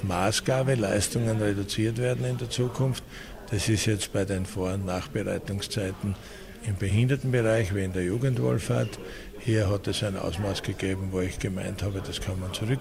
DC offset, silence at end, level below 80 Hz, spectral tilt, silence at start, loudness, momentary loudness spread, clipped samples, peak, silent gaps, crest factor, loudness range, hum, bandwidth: under 0.1%; 0 s; -46 dBFS; -5.5 dB/octave; 0 s; -28 LUFS; 9 LU; under 0.1%; -12 dBFS; none; 16 dB; 3 LU; none; 16 kHz